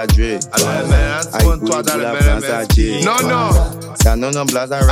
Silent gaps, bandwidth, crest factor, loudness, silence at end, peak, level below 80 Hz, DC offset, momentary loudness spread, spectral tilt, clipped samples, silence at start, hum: none; 16 kHz; 14 dB; -15 LUFS; 0 s; 0 dBFS; -18 dBFS; under 0.1%; 3 LU; -4.5 dB/octave; under 0.1%; 0 s; none